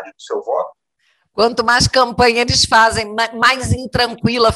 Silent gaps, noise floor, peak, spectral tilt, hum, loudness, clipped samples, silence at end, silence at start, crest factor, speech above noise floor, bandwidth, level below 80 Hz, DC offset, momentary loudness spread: none; -63 dBFS; -2 dBFS; -3.5 dB/octave; none; -14 LUFS; under 0.1%; 0 s; 0 s; 14 dB; 48 dB; 15.5 kHz; -36 dBFS; under 0.1%; 11 LU